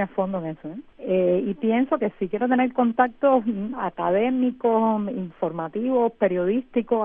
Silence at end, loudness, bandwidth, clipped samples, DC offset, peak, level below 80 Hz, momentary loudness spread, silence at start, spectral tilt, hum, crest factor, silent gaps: 0 s; -23 LUFS; 3.7 kHz; under 0.1%; under 0.1%; -4 dBFS; -60 dBFS; 8 LU; 0 s; -11 dB/octave; none; 18 dB; none